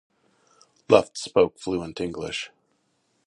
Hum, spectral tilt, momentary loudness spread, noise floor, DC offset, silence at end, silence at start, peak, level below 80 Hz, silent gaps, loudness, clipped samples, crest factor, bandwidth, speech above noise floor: none; -4.5 dB/octave; 12 LU; -70 dBFS; under 0.1%; 0.8 s; 0.9 s; -2 dBFS; -56 dBFS; none; -24 LUFS; under 0.1%; 26 dB; 11.5 kHz; 47 dB